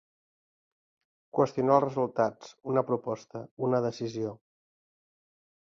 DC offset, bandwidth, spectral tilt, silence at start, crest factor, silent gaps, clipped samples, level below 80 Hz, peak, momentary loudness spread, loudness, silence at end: under 0.1%; 7.6 kHz; -7.5 dB/octave; 1.35 s; 22 dB; 3.51-3.57 s; under 0.1%; -72 dBFS; -10 dBFS; 13 LU; -29 LUFS; 1.3 s